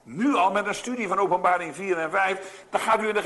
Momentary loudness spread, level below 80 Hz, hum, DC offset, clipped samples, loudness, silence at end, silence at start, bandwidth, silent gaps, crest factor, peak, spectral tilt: 7 LU; -66 dBFS; none; under 0.1%; under 0.1%; -24 LUFS; 0 s; 0.05 s; 12 kHz; none; 14 dB; -10 dBFS; -4 dB/octave